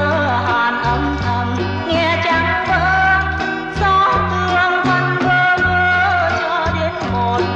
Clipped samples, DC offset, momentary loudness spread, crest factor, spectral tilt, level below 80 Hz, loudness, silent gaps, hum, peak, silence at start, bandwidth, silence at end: under 0.1%; under 0.1%; 6 LU; 10 dB; -6 dB/octave; -32 dBFS; -15 LUFS; none; none; -4 dBFS; 0 s; 8.2 kHz; 0 s